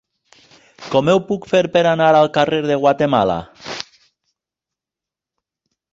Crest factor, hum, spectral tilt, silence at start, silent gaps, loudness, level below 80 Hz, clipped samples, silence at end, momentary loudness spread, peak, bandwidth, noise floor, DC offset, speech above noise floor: 16 dB; none; -6 dB/octave; 0.8 s; none; -16 LUFS; -54 dBFS; under 0.1%; 2.1 s; 17 LU; -2 dBFS; 7.8 kHz; -87 dBFS; under 0.1%; 72 dB